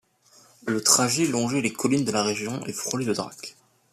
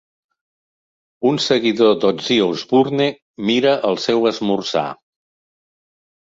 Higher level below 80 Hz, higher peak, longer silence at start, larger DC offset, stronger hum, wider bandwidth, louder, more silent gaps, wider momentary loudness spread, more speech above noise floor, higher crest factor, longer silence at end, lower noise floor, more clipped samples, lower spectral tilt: about the same, -66 dBFS vs -62 dBFS; about the same, -4 dBFS vs -2 dBFS; second, 0.65 s vs 1.2 s; neither; neither; first, 14.5 kHz vs 7.8 kHz; second, -24 LUFS vs -17 LUFS; second, none vs 3.22-3.34 s; first, 17 LU vs 7 LU; second, 32 dB vs over 73 dB; first, 22 dB vs 16 dB; second, 0.4 s vs 1.45 s; second, -57 dBFS vs under -90 dBFS; neither; second, -3 dB/octave vs -5 dB/octave